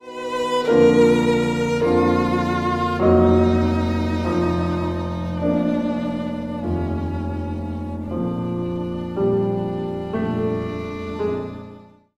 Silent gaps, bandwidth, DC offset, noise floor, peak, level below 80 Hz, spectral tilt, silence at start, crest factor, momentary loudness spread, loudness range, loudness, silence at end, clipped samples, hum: none; 12 kHz; under 0.1%; -43 dBFS; -4 dBFS; -38 dBFS; -7.5 dB/octave; 0.05 s; 16 dB; 12 LU; 7 LU; -21 LUFS; 0.35 s; under 0.1%; none